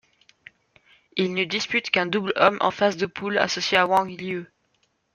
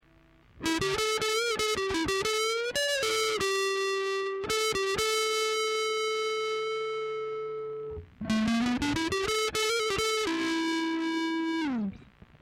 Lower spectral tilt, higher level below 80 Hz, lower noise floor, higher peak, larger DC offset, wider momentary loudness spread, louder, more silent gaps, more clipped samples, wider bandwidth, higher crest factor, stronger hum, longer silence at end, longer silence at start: first, -4 dB/octave vs -2.5 dB/octave; second, -66 dBFS vs -54 dBFS; first, -69 dBFS vs -60 dBFS; first, -2 dBFS vs -14 dBFS; neither; first, 11 LU vs 7 LU; first, -23 LUFS vs -29 LUFS; neither; neither; second, 13.5 kHz vs 16 kHz; first, 22 dB vs 16 dB; neither; first, 0.7 s vs 0.35 s; first, 1.15 s vs 0.55 s